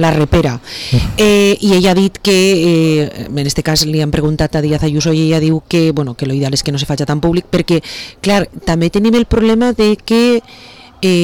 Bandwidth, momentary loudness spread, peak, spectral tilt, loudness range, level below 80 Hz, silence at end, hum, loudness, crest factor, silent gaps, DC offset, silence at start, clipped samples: 19 kHz; 7 LU; -4 dBFS; -5.5 dB/octave; 3 LU; -30 dBFS; 0 s; none; -13 LUFS; 8 dB; none; under 0.1%; 0 s; under 0.1%